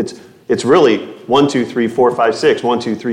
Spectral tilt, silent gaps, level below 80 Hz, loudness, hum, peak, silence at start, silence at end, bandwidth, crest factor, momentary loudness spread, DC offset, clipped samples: -5 dB/octave; none; -58 dBFS; -14 LUFS; none; 0 dBFS; 0 s; 0 s; 11 kHz; 14 dB; 8 LU; under 0.1%; under 0.1%